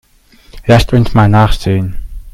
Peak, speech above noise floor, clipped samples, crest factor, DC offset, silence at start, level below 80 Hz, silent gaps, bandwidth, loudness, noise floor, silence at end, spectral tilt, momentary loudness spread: 0 dBFS; 35 dB; 0.3%; 12 dB; under 0.1%; 0.55 s; -22 dBFS; none; 14 kHz; -10 LUFS; -44 dBFS; 0.05 s; -7 dB/octave; 14 LU